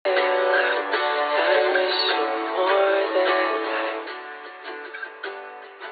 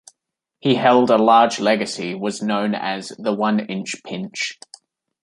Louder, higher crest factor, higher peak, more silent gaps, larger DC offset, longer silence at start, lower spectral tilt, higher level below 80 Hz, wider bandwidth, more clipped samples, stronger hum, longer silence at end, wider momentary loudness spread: about the same, -21 LUFS vs -19 LUFS; about the same, 16 dB vs 18 dB; second, -8 dBFS vs -2 dBFS; neither; neither; second, 0.05 s vs 0.65 s; second, 4.5 dB/octave vs -4.5 dB/octave; second, under -90 dBFS vs -68 dBFS; second, 4.9 kHz vs 11.5 kHz; neither; neither; second, 0 s vs 0.7 s; first, 16 LU vs 13 LU